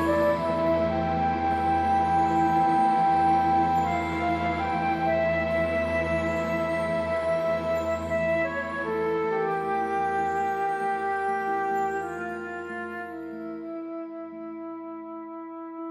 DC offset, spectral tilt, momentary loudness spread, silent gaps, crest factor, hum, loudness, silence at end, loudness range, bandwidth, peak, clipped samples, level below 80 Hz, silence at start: under 0.1%; -7 dB/octave; 15 LU; none; 14 dB; none; -26 LUFS; 0 s; 10 LU; 14 kHz; -12 dBFS; under 0.1%; -48 dBFS; 0 s